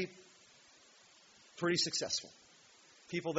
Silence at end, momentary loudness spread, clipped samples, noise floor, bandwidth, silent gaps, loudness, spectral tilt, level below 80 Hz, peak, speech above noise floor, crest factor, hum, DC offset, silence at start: 0 s; 25 LU; under 0.1%; -63 dBFS; 8 kHz; none; -36 LUFS; -2.5 dB/octave; -80 dBFS; -20 dBFS; 27 dB; 22 dB; none; under 0.1%; 0 s